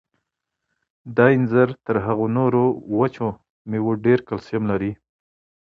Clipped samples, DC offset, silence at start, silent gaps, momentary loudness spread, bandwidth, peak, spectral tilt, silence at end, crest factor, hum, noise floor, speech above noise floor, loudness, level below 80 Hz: under 0.1%; under 0.1%; 1.05 s; 3.50-3.65 s; 11 LU; 6.2 kHz; -2 dBFS; -10 dB/octave; 0.75 s; 20 dB; none; -80 dBFS; 61 dB; -21 LUFS; -54 dBFS